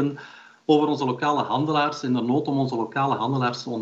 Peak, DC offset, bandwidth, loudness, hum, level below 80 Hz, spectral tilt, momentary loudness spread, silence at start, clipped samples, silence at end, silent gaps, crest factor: -6 dBFS; under 0.1%; 7.8 kHz; -23 LUFS; none; -74 dBFS; -6.5 dB/octave; 5 LU; 0 s; under 0.1%; 0 s; none; 16 dB